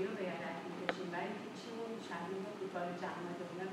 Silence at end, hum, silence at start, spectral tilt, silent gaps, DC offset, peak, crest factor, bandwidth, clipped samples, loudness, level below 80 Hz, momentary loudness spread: 0 s; none; 0 s; -5.5 dB/octave; none; under 0.1%; -16 dBFS; 26 dB; 15.5 kHz; under 0.1%; -43 LUFS; -88 dBFS; 4 LU